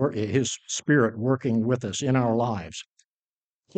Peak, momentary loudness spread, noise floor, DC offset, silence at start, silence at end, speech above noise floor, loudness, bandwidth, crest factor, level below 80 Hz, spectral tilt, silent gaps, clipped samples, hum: -8 dBFS; 9 LU; under -90 dBFS; under 0.1%; 0 s; 0.95 s; over 65 dB; -25 LUFS; 9.2 kHz; 18 dB; -60 dBFS; -5.5 dB/octave; none; under 0.1%; none